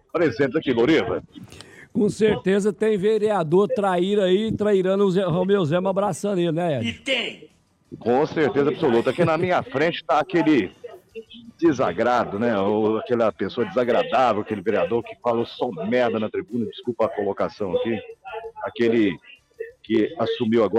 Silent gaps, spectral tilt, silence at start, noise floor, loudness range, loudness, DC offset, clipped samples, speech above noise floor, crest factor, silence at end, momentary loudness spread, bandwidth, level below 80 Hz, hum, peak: none; -6.5 dB/octave; 0.15 s; -41 dBFS; 5 LU; -22 LUFS; under 0.1%; under 0.1%; 20 dB; 14 dB; 0 s; 11 LU; 11.5 kHz; -58 dBFS; none; -8 dBFS